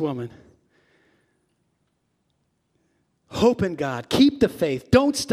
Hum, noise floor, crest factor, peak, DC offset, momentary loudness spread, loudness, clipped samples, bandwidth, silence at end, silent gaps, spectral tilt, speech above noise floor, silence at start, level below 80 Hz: none; -71 dBFS; 22 dB; -4 dBFS; under 0.1%; 14 LU; -21 LUFS; under 0.1%; 15.5 kHz; 0 s; none; -5.5 dB/octave; 51 dB; 0 s; -52 dBFS